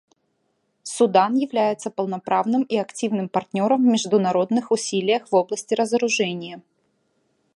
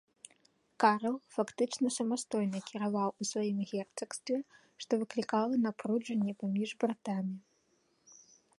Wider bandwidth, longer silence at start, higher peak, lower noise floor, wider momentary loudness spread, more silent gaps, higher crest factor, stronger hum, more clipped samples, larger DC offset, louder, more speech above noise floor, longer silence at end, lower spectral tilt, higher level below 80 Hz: about the same, 11.5 kHz vs 11.5 kHz; about the same, 0.85 s vs 0.8 s; first, -4 dBFS vs -12 dBFS; about the same, -71 dBFS vs -74 dBFS; about the same, 9 LU vs 8 LU; neither; about the same, 18 dB vs 22 dB; neither; neither; neither; first, -21 LUFS vs -34 LUFS; first, 50 dB vs 40 dB; second, 0.95 s vs 1.2 s; about the same, -4.5 dB/octave vs -5 dB/octave; first, -74 dBFS vs -82 dBFS